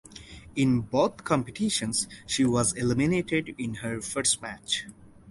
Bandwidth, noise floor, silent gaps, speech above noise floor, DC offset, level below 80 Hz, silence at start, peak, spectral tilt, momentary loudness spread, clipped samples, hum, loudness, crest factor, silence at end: 11.5 kHz; -46 dBFS; none; 19 dB; under 0.1%; -54 dBFS; 0.1 s; -10 dBFS; -4 dB/octave; 9 LU; under 0.1%; none; -27 LUFS; 18 dB; 0 s